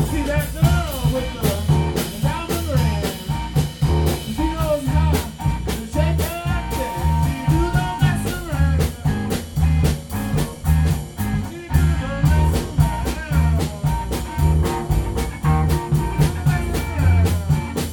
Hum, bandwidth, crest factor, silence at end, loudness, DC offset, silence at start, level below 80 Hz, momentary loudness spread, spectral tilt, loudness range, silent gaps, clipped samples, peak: none; 19 kHz; 16 dB; 0 s; -21 LUFS; under 0.1%; 0 s; -24 dBFS; 6 LU; -6.5 dB/octave; 1 LU; none; under 0.1%; -2 dBFS